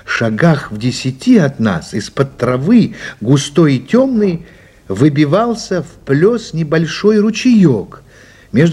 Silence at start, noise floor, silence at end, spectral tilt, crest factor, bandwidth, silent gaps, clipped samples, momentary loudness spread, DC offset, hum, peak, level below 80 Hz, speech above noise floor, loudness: 0.05 s; -40 dBFS; 0 s; -6.5 dB/octave; 12 dB; 12 kHz; none; under 0.1%; 9 LU; under 0.1%; none; 0 dBFS; -46 dBFS; 27 dB; -13 LUFS